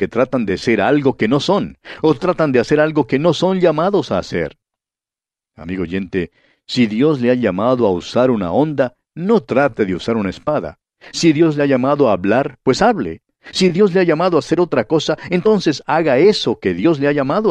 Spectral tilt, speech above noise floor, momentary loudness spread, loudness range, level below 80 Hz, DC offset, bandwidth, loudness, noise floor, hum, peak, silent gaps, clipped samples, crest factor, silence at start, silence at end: -6 dB/octave; 75 dB; 9 LU; 4 LU; -48 dBFS; under 0.1%; 10 kHz; -16 LUFS; -90 dBFS; none; -2 dBFS; none; under 0.1%; 14 dB; 0 s; 0 s